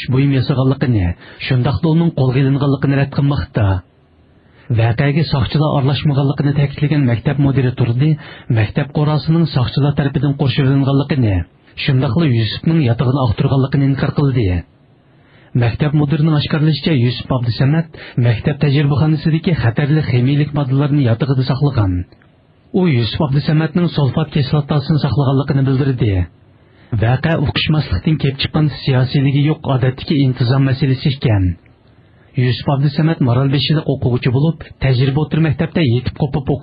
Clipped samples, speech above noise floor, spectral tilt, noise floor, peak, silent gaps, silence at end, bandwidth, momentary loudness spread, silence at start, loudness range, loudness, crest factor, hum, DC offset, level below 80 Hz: under 0.1%; 35 dB; -11 dB/octave; -49 dBFS; -4 dBFS; none; 0 s; 5.2 kHz; 4 LU; 0 s; 2 LU; -15 LUFS; 12 dB; none; under 0.1%; -38 dBFS